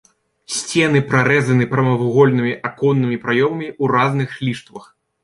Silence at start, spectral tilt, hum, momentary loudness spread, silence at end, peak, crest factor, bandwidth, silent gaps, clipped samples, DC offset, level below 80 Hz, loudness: 0.5 s; -6 dB/octave; none; 10 LU; 0.45 s; -2 dBFS; 16 dB; 11.5 kHz; none; under 0.1%; under 0.1%; -56 dBFS; -17 LUFS